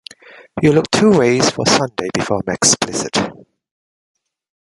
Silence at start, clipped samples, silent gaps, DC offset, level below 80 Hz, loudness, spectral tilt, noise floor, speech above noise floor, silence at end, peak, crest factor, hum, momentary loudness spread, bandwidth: 0.55 s; under 0.1%; none; under 0.1%; -48 dBFS; -15 LUFS; -3.5 dB/octave; -42 dBFS; 28 dB; 1.35 s; 0 dBFS; 18 dB; none; 8 LU; 11.5 kHz